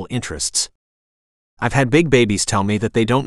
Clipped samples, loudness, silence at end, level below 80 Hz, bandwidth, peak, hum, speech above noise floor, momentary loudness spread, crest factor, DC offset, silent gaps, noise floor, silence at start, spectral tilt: under 0.1%; -18 LUFS; 0 s; -42 dBFS; 13.5 kHz; 0 dBFS; none; over 73 dB; 10 LU; 18 dB; under 0.1%; 0.75-1.57 s; under -90 dBFS; 0 s; -4.5 dB/octave